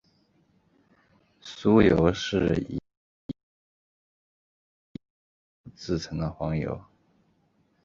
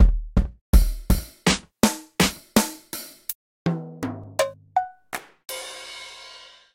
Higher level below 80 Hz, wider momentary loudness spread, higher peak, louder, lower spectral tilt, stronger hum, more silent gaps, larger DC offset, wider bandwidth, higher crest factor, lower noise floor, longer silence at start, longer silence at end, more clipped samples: second, -48 dBFS vs -26 dBFS; first, 27 LU vs 14 LU; about the same, -6 dBFS vs -4 dBFS; about the same, -25 LUFS vs -25 LUFS; first, -7 dB/octave vs -4.5 dB/octave; neither; first, 2.97-3.29 s, 3.43-4.95 s, 5.10-5.64 s vs 0.61-0.73 s, 3.35-3.65 s; neither; second, 7.6 kHz vs 16.5 kHz; about the same, 24 dB vs 20 dB; first, -68 dBFS vs -46 dBFS; first, 1.45 s vs 0 s; first, 1 s vs 0.4 s; neither